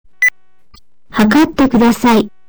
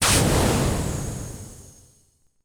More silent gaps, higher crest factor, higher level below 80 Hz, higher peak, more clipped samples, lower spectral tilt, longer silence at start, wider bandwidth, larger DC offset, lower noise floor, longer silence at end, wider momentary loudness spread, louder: neither; second, 8 dB vs 18 dB; about the same, -38 dBFS vs -34 dBFS; about the same, -4 dBFS vs -6 dBFS; neither; about the same, -5 dB/octave vs -4 dB/octave; first, 0.2 s vs 0 s; about the same, over 20 kHz vs over 20 kHz; neither; second, -46 dBFS vs -62 dBFS; second, 0.2 s vs 0.8 s; second, 4 LU vs 20 LU; first, -12 LUFS vs -22 LUFS